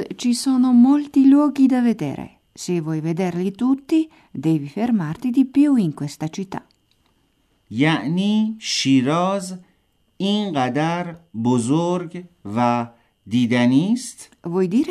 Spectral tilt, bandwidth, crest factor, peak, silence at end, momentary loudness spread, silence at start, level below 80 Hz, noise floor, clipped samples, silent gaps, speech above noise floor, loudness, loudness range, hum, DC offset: -6 dB/octave; 13 kHz; 16 dB; -4 dBFS; 0 s; 16 LU; 0 s; -64 dBFS; -64 dBFS; under 0.1%; none; 45 dB; -19 LUFS; 5 LU; none; under 0.1%